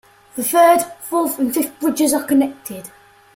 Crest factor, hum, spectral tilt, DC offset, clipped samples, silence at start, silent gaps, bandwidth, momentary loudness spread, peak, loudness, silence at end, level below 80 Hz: 18 dB; none; -3 dB/octave; under 0.1%; under 0.1%; 0.35 s; none; 16.5 kHz; 19 LU; -2 dBFS; -17 LUFS; 0.45 s; -62 dBFS